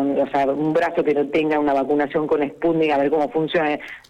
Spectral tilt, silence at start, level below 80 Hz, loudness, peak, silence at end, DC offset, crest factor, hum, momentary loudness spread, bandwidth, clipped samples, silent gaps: -7 dB/octave; 0 s; -56 dBFS; -20 LUFS; -10 dBFS; 0.1 s; under 0.1%; 10 dB; none; 2 LU; 8.8 kHz; under 0.1%; none